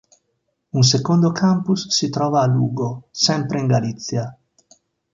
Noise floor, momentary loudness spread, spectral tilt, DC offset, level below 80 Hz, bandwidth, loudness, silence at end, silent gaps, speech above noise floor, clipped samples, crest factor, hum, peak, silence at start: -72 dBFS; 10 LU; -5 dB/octave; under 0.1%; -58 dBFS; 7.6 kHz; -19 LUFS; 0.8 s; none; 54 dB; under 0.1%; 16 dB; none; -4 dBFS; 0.75 s